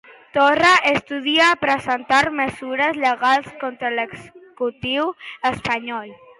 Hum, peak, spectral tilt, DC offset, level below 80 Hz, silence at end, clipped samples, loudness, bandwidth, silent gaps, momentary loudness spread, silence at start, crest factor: none; -4 dBFS; -3.5 dB/octave; under 0.1%; -54 dBFS; 0.25 s; under 0.1%; -19 LUFS; 11.5 kHz; none; 13 LU; 0.35 s; 16 dB